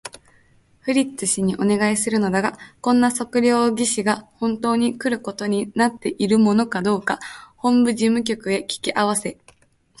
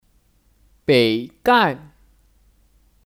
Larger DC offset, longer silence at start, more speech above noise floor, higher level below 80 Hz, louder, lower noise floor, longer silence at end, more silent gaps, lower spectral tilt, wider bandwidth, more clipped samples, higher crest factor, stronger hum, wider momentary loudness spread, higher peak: neither; second, 0.05 s vs 0.9 s; second, 36 dB vs 42 dB; about the same, -58 dBFS vs -56 dBFS; about the same, -20 LUFS vs -18 LUFS; about the same, -56 dBFS vs -59 dBFS; second, 0.65 s vs 1.3 s; neither; about the same, -4.5 dB/octave vs -5.5 dB/octave; second, 11.5 kHz vs 16.5 kHz; neither; about the same, 16 dB vs 18 dB; neither; second, 8 LU vs 12 LU; about the same, -4 dBFS vs -4 dBFS